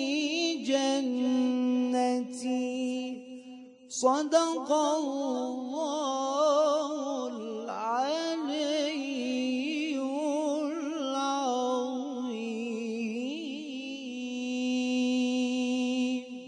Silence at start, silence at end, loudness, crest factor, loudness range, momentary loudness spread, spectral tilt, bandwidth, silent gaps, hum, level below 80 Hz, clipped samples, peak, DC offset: 0 s; 0 s; -30 LUFS; 18 dB; 4 LU; 10 LU; -3 dB/octave; 10.5 kHz; none; none; -84 dBFS; under 0.1%; -12 dBFS; under 0.1%